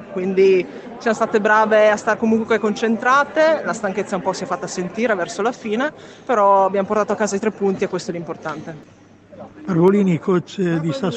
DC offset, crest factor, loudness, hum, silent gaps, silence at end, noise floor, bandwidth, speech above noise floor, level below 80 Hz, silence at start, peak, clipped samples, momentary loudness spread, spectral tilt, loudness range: under 0.1%; 16 dB; -18 LUFS; none; none; 0 s; -40 dBFS; 8.8 kHz; 22 dB; -62 dBFS; 0 s; -2 dBFS; under 0.1%; 11 LU; -6 dB/octave; 4 LU